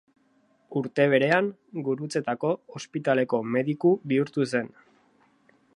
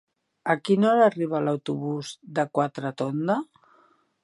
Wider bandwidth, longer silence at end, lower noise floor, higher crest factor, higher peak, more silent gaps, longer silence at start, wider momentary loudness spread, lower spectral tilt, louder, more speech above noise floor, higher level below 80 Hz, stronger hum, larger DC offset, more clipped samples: about the same, 11.5 kHz vs 11.5 kHz; first, 1.1 s vs 0.8 s; about the same, -65 dBFS vs -62 dBFS; about the same, 20 dB vs 20 dB; about the same, -6 dBFS vs -6 dBFS; neither; first, 0.7 s vs 0.45 s; about the same, 11 LU vs 11 LU; about the same, -6.5 dB/octave vs -6.5 dB/octave; about the same, -26 LUFS vs -25 LUFS; about the same, 40 dB vs 38 dB; about the same, -76 dBFS vs -76 dBFS; neither; neither; neither